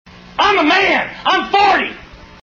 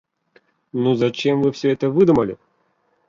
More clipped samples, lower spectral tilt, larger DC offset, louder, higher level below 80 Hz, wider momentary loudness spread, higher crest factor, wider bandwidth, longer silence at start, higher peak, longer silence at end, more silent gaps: neither; second, -3 dB/octave vs -7.5 dB/octave; neither; first, -13 LUFS vs -19 LUFS; first, -46 dBFS vs -54 dBFS; second, 7 LU vs 12 LU; about the same, 16 dB vs 16 dB; about the same, 7.4 kHz vs 7.4 kHz; second, 0.35 s vs 0.75 s; first, 0 dBFS vs -4 dBFS; second, 0.3 s vs 0.75 s; neither